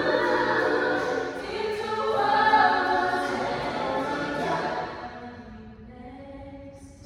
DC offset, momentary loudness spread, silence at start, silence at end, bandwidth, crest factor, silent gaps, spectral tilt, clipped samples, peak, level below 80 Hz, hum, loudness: under 0.1%; 23 LU; 0 s; 0 s; 12.5 kHz; 18 dB; none; -4.5 dB/octave; under 0.1%; -8 dBFS; -54 dBFS; none; -25 LUFS